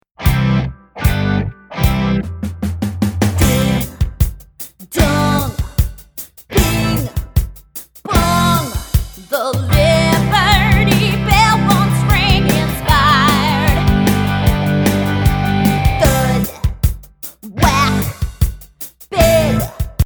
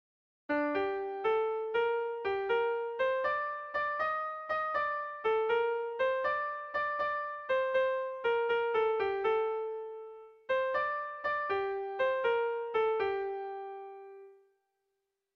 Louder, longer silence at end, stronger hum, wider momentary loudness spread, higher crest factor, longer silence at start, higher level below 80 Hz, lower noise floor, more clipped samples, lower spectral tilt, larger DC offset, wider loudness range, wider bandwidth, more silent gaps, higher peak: first, -15 LUFS vs -32 LUFS; second, 0 s vs 1.05 s; neither; first, 12 LU vs 8 LU; about the same, 14 dB vs 14 dB; second, 0.2 s vs 0.5 s; first, -22 dBFS vs -72 dBFS; second, -35 dBFS vs -84 dBFS; neither; about the same, -5.5 dB/octave vs -5.5 dB/octave; neither; first, 6 LU vs 2 LU; first, over 20 kHz vs 5.8 kHz; neither; first, 0 dBFS vs -20 dBFS